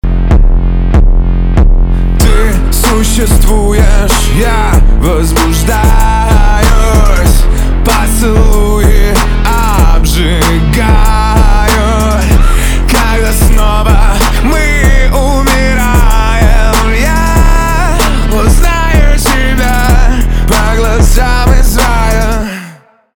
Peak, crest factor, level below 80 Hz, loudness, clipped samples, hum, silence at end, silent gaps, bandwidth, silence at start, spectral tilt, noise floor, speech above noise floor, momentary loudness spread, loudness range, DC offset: 0 dBFS; 6 dB; -8 dBFS; -9 LUFS; under 0.1%; none; 0.4 s; none; 18.5 kHz; 0.05 s; -5 dB/octave; -34 dBFS; 28 dB; 2 LU; 1 LU; under 0.1%